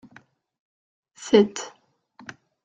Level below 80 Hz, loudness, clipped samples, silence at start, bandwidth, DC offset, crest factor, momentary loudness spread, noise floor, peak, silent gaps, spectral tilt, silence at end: -70 dBFS; -20 LUFS; under 0.1%; 1.2 s; 9.2 kHz; under 0.1%; 24 dB; 25 LU; -55 dBFS; -4 dBFS; none; -5 dB/octave; 0.95 s